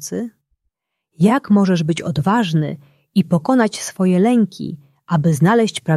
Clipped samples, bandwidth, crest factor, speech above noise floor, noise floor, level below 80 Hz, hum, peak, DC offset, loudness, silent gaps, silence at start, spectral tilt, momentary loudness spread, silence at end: under 0.1%; 13 kHz; 14 dB; 58 dB; -74 dBFS; -58 dBFS; none; -2 dBFS; under 0.1%; -17 LUFS; none; 0 s; -6.5 dB/octave; 13 LU; 0 s